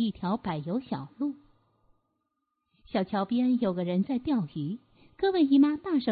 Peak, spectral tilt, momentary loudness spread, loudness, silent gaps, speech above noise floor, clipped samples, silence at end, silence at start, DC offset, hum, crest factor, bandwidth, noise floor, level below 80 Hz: -14 dBFS; -11 dB/octave; 12 LU; -28 LUFS; none; 53 dB; under 0.1%; 0 s; 0 s; under 0.1%; none; 16 dB; 4.8 kHz; -80 dBFS; -62 dBFS